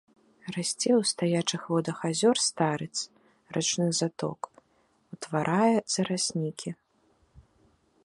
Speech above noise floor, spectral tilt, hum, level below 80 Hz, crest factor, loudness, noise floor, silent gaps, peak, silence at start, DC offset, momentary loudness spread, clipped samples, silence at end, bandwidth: 40 dB; -4 dB/octave; none; -70 dBFS; 20 dB; -28 LUFS; -68 dBFS; none; -10 dBFS; 0.45 s; under 0.1%; 15 LU; under 0.1%; 0.65 s; 11.5 kHz